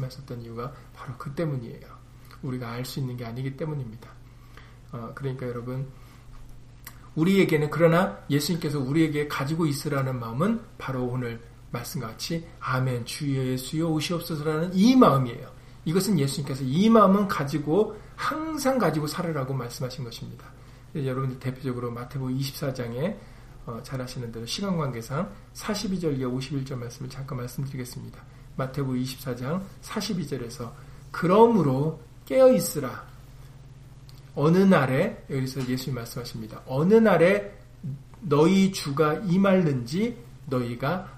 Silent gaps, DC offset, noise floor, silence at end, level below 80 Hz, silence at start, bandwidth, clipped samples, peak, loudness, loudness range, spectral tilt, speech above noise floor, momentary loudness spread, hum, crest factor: none; under 0.1%; -47 dBFS; 0 s; -50 dBFS; 0 s; 15.5 kHz; under 0.1%; -4 dBFS; -26 LUFS; 11 LU; -6.5 dB/octave; 22 dB; 19 LU; none; 22 dB